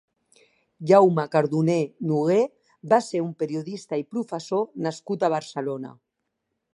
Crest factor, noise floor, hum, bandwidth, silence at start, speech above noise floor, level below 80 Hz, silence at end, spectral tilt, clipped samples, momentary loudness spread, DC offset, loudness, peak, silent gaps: 20 dB; -79 dBFS; none; 11 kHz; 0.8 s; 56 dB; -74 dBFS; 0.85 s; -7 dB/octave; under 0.1%; 12 LU; under 0.1%; -24 LUFS; -4 dBFS; none